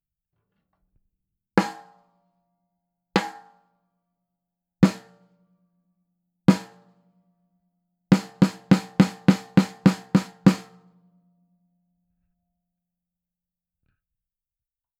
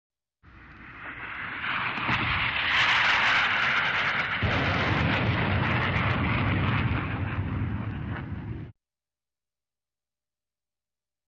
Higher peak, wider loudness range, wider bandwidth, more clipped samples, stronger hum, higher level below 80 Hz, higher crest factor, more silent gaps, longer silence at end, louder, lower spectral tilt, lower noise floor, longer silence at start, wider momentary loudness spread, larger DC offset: first, 0 dBFS vs -12 dBFS; second, 10 LU vs 14 LU; first, 13 kHz vs 8 kHz; neither; second, none vs 60 Hz at -50 dBFS; second, -60 dBFS vs -44 dBFS; first, 26 dB vs 16 dB; neither; first, 4.4 s vs 2.6 s; first, -22 LUFS vs -25 LUFS; first, -7 dB/octave vs -5.5 dB/octave; about the same, under -90 dBFS vs under -90 dBFS; first, 1.55 s vs 0.55 s; second, 8 LU vs 15 LU; neither